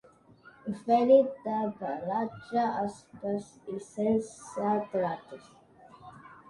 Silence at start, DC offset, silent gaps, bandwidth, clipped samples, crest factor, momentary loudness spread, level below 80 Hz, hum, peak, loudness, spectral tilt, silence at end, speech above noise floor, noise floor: 0.65 s; under 0.1%; none; 11.5 kHz; under 0.1%; 20 dB; 18 LU; -70 dBFS; none; -10 dBFS; -30 LUFS; -6.5 dB/octave; 0.15 s; 28 dB; -57 dBFS